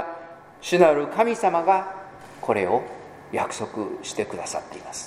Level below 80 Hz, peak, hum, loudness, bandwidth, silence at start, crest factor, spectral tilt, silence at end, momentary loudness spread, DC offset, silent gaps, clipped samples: -64 dBFS; -2 dBFS; none; -23 LUFS; 15 kHz; 0 s; 22 dB; -4.5 dB/octave; 0 s; 20 LU; under 0.1%; none; under 0.1%